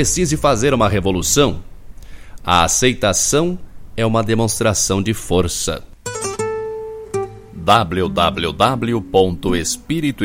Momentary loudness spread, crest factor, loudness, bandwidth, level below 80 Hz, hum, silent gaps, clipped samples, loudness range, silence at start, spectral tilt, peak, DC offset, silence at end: 11 LU; 18 dB; -17 LUFS; 16.5 kHz; -34 dBFS; none; none; under 0.1%; 4 LU; 0 s; -4 dB/octave; 0 dBFS; under 0.1%; 0 s